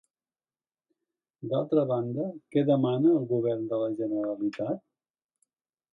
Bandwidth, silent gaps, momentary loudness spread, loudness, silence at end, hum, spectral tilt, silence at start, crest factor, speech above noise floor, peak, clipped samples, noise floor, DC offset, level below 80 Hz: 5.6 kHz; none; 10 LU; -28 LUFS; 1.15 s; none; -10 dB/octave; 1.4 s; 16 dB; over 63 dB; -12 dBFS; under 0.1%; under -90 dBFS; under 0.1%; -76 dBFS